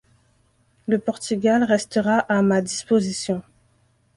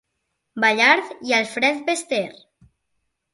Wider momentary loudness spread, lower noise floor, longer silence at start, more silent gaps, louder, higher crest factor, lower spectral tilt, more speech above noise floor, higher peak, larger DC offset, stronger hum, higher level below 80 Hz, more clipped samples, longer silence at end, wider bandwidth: about the same, 8 LU vs 10 LU; second, -62 dBFS vs -76 dBFS; first, 0.9 s vs 0.55 s; neither; about the same, -21 LUFS vs -19 LUFS; about the same, 18 dB vs 22 dB; first, -5 dB/octave vs -2 dB/octave; second, 42 dB vs 56 dB; about the same, -4 dBFS vs -2 dBFS; neither; neither; first, -60 dBFS vs -70 dBFS; neither; second, 0.75 s vs 1 s; about the same, 11.5 kHz vs 11.5 kHz